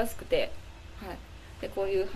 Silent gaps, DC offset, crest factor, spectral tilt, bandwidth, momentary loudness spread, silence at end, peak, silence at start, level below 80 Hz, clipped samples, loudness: none; under 0.1%; 18 dB; -4.5 dB/octave; 14 kHz; 18 LU; 0 s; -14 dBFS; 0 s; -46 dBFS; under 0.1%; -33 LUFS